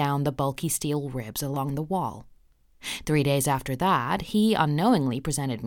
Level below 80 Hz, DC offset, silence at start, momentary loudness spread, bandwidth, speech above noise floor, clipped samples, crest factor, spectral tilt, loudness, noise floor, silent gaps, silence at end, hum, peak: -50 dBFS; under 0.1%; 0 s; 10 LU; 19 kHz; 32 dB; under 0.1%; 18 dB; -5 dB/octave; -26 LUFS; -57 dBFS; none; 0 s; none; -8 dBFS